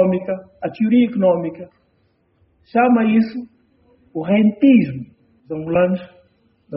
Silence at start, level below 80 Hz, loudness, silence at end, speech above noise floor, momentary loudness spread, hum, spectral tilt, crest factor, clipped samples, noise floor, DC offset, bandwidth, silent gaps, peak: 0 s; -58 dBFS; -17 LUFS; 0 s; 45 dB; 17 LU; none; -7 dB/octave; 16 dB; under 0.1%; -62 dBFS; under 0.1%; 5.6 kHz; none; -2 dBFS